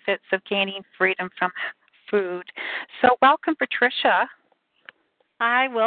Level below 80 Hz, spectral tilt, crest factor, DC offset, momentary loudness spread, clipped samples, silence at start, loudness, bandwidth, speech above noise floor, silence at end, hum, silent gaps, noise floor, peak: -68 dBFS; -8 dB/octave; 20 dB; under 0.1%; 12 LU; under 0.1%; 0.05 s; -22 LUFS; 4.7 kHz; 45 dB; 0 s; none; none; -67 dBFS; -4 dBFS